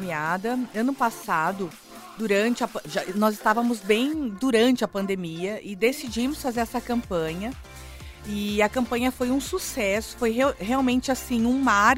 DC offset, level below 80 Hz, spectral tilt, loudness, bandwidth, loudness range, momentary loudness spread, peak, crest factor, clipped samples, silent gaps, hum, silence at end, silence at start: under 0.1%; -48 dBFS; -4.5 dB/octave; -25 LUFS; 16 kHz; 4 LU; 11 LU; -4 dBFS; 20 dB; under 0.1%; none; none; 0 s; 0 s